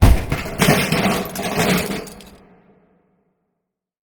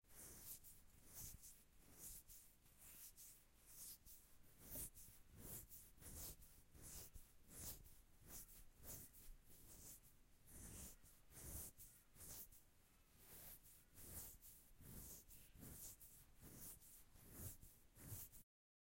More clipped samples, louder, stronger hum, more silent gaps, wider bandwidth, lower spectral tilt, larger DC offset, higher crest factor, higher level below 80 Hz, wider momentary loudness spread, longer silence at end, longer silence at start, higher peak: neither; first, -19 LUFS vs -59 LUFS; neither; neither; first, over 20 kHz vs 16.5 kHz; first, -5 dB/octave vs -3 dB/octave; neither; about the same, 20 dB vs 22 dB; first, -26 dBFS vs -70 dBFS; about the same, 10 LU vs 10 LU; first, 1.8 s vs 0.45 s; about the same, 0 s vs 0.05 s; first, 0 dBFS vs -38 dBFS